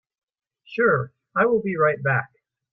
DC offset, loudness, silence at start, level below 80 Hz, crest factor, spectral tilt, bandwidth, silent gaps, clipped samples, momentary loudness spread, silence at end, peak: under 0.1%; -22 LUFS; 0.7 s; -62 dBFS; 16 dB; -10 dB/octave; 5.6 kHz; none; under 0.1%; 6 LU; 0.45 s; -8 dBFS